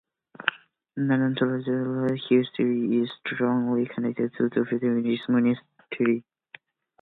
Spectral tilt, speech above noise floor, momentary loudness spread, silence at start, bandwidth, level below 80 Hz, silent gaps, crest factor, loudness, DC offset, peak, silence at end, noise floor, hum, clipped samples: -9.5 dB/octave; 28 dB; 7 LU; 0.4 s; 4.1 kHz; -72 dBFS; none; 24 dB; -26 LUFS; under 0.1%; -2 dBFS; 0.8 s; -52 dBFS; none; under 0.1%